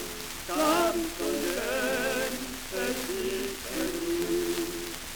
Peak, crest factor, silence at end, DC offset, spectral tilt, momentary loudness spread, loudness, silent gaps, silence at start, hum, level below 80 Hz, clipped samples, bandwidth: -10 dBFS; 20 dB; 0 s; under 0.1%; -2.5 dB/octave; 8 LU; -30 LUFS; none; 0 s; none; -48 dBFS; under 0.1%; over 20 kHz